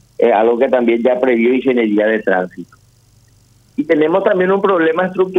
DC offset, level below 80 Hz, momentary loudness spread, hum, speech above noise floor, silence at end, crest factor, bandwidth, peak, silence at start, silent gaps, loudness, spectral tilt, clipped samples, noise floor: under 0.1%; -60 dBFS; 5 LU; none; 37 dB; 0 s; 14 dB; 6.8 kHz; 0 dBFS; 0.2 s; none; -14 LUFS; -7.5 dB/octave; under 0.1%; -50 dBFS